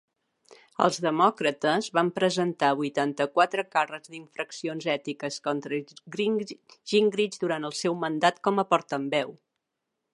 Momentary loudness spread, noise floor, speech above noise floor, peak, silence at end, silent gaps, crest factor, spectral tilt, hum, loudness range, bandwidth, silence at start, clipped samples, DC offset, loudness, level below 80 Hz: 11 LU; -83 dBFS; 56 dB; -6 dBFS; 0.8 s; none; 22 dB; -4.5 dB/octave; none; 4 LU; 11.5 kHz; 0.5 s; under 0.1%; under 0.1%; -27 LUFS; -80 dBFS